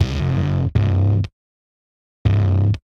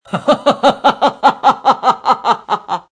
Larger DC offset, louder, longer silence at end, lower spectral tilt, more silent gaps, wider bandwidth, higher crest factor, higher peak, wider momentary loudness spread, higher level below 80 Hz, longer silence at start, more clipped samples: neither; second, -19 LUFS vs -13 LUFS; about the same, 0.2 s vs 0.1 s; first, -8.5 dB/octave vs -4.5 dB/octave; first, 1.33-2.25 s vs none; second, 6.4 kHz vs 10.5 kHz; about the same, 14 dB vs 14 dB; second, -4 dBFS vs 0 dBFS; about the same, 5 LU vs 5 LU; first, -32 dBFS vs -54 dBFS; about the same, 0 s vs 0.1 s; neither